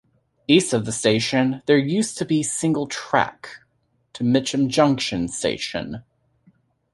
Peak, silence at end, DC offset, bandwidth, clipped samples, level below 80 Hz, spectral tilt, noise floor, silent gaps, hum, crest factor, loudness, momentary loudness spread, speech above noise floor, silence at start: -2 dBFS; 0.95 s; under 0.1%; 11.5 kHz; under 0.1%; -54 dBFS; -4.5 dB/octave; -68 dBFS; none; none; 20 dB; -21 LUFS; 11 LU; 47 dB; 0.5 s